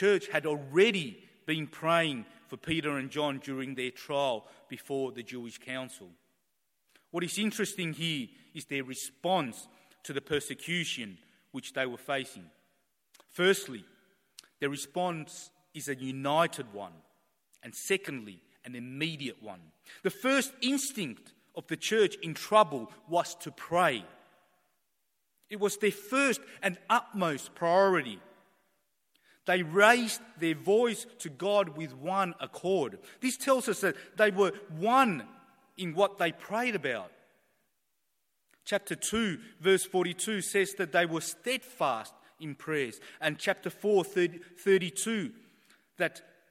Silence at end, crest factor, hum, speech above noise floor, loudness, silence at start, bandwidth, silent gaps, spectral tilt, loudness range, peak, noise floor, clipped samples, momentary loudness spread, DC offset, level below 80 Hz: 0.3 s; 26 dB; none; 50 dB; -31 LUFS; 0 s; 16.5 kHz; none; -4 dB/octave; 7 LU; -6 dBFS; -81 dBFS; under 0.1%; 17 LU; under 0.1%; -72 dBFS